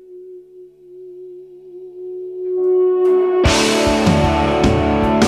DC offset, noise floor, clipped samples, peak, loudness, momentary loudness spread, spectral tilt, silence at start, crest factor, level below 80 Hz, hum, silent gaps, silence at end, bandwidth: under 0.1%; -41 dBFS; under 0.1%; -2 dBFS; -15 LUFS; 23 LU; -5.5 dB/octave; 0.1 s; 14 dB; -30 dBFS; none; none; 0 s; 13.5 kHz